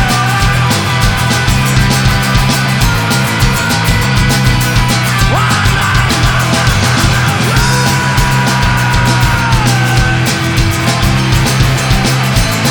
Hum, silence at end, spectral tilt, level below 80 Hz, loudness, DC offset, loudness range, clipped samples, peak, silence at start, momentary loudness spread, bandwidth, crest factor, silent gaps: none; 0 s; -4 dB/octave; -20 dBFS; -10 LUFS; under 0.1%; 1 LU; under 0.1%; 0 dBFS; 0 s; 1 LU; over 20 kHz; 10 dB; none